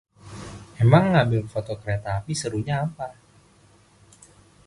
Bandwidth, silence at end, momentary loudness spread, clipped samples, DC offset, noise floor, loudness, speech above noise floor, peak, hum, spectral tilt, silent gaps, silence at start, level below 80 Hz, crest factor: 11.5 kHz; 1.55 s; 22 LU; under 0.1%; under 0.1%; -56 dBFS; -23 LUFS; 34 dB; -2 dBFS; none; -6.5 dB/octave; none; 0.25 s; -50 dBFS; 24 dB